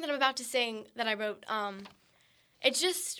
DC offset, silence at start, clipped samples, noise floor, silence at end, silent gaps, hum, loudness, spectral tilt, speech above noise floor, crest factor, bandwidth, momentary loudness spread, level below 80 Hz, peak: under 0.1%; 0 s; under 0.1%; -67 dBFS; 0 s; none; none; -31 LUFS; -1 dB/octave; 34 dB; 24 dB; over 20 kHz; 7 LU; -82 dBFS; -10 dBFS